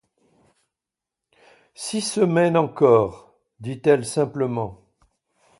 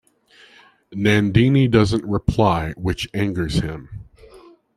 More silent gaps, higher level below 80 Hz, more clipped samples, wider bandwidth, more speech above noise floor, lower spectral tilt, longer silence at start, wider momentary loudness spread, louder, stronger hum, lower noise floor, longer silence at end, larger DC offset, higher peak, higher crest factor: neither; second, -58 dBFS vs -38 dBFS; neither; second, 11.5 kHz vs 13.5 kHz; first, 67 dB vs 34 dB; second, -5.5 dB/octave vs -7 dB/octave; first, 1.8 s vs 0.9 s; about the same, 17 LU vs 18 LU; about the same, -21 LUFS vs -19 LUFS; neither; first, -87 dBFS vs -52 dBFS; first, 0.85 s vs 0.4 s; neither; about the same, -2 dBFS vs -2 dBFS; about the same, 20 dB vs 18 dB